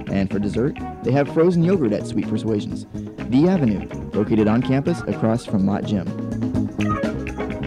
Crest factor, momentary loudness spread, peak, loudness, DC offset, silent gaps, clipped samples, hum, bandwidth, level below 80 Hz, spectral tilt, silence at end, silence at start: 14 dB; 10 LU; -6 dBFS; -21 LUFS; under 0.1%; none; under 0.1%; none; 11 kHz; -42 dBFS; -8 dB/octave; 0 s; 0 s